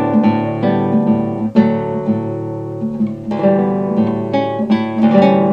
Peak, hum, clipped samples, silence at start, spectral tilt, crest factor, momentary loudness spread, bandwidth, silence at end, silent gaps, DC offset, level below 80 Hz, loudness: 0 dBFS; none; under 0.1%; 0 s; -9.5 dB/octave; 14 dB; 8 LU; 5.4 kHz; 0 s; none; under 0.1%; -50 dBFS; -16 LUFS